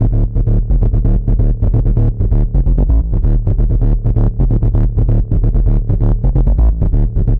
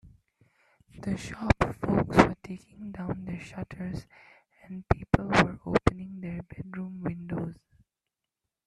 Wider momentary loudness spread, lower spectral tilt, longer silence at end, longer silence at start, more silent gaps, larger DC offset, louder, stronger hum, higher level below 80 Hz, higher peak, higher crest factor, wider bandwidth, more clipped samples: second, 2 LU vs 17 LU; first, -12.5 dB/octave vs -6.5 dB/octave; second, 0 s vs 1.15 s; about the same, 0 s vs 0.05 s; neither; neither; first, -15 LUFS vs -29 LUFS; neither; first, -12 dBFS vs -44 dBFS; about the same, -4 dBFS vs -2 dBFS; second, 8 dB vs 28 dB; second, 1.8 kHz vs 12.5 kHz; neither